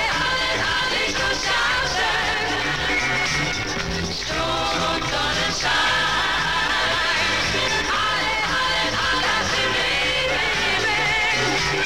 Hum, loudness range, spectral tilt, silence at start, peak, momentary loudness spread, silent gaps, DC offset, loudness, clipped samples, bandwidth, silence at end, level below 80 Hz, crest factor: none; 2 LU; -2 dB/octave; 0 s; -10 dBFS; 3 LU; none; 0.7%; -20 LUFS; under 0.1%; 16 kHz; 0 s; -40 dBFS; 12 dB